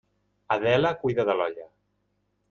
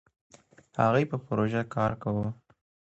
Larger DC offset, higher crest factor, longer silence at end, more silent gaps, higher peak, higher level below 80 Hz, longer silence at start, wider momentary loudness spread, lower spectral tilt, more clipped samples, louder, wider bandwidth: neither; about the same, 18 dB vs 20 dB; first, 0.85 s vs 0.55 s; neither; about the same, -10 dBFS vs -8 dBFS; about the same, -62 dBFS vs -58 dBFS; second, 0.5 s vs 0.75 s; second, 8 LU vs 12 LU; about the same, -7 dB/octave vs -8 dB/octave; neither; first, -25 LUFS vs -29 LUFS; second, 7 kHz vs 8.2 kHz